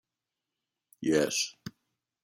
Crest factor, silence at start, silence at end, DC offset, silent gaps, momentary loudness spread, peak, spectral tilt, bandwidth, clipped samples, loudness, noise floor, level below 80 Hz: 22 dB; 1 s; 0.55 s; under 0.1%; none; 21 LU; -14 dBFS; -3 dB/octave; 16.5 kHz; under 0.1%; -30 LUFS; -88 dBFS; -70 dBFS